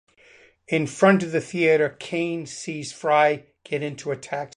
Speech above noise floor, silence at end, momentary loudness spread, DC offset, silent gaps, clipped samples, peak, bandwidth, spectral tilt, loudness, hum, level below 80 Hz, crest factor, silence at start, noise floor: 31 dB; 0.1 s; 13 LU; under 0.1%; none; under 0.1%; -4 dBFS; 11 kHz; -5.5 dB/octave; -23 LUFS; none; -68 dBFS; 18 dB; 0.7 s; -54 dBFS